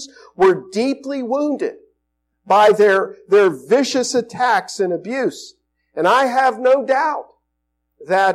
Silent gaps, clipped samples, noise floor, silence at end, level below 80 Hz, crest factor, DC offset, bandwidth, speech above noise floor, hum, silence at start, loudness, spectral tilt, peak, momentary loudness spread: none; under 0.1%; -73 dBFS; 0 s; -66 dBFS; 12 dB; under 0.1%; 13 kHz; 57 dB; none; 0 s; -17 LUFS; -4 dB/octave; -6 dBFS; 11 LU